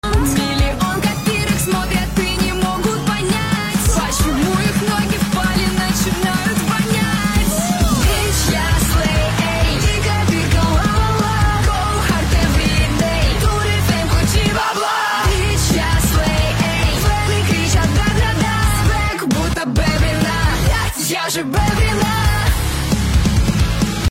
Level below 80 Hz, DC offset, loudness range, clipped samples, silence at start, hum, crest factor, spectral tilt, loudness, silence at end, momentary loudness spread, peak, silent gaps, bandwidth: -22 dBFS; under 0.1%; 1 LU; under 0.1%; 0.05 s; none; 12 dB; -4.5 dB/octave; -16 LUFS; 0 s; 3 LU; -4 dBFS; none; 17 kHz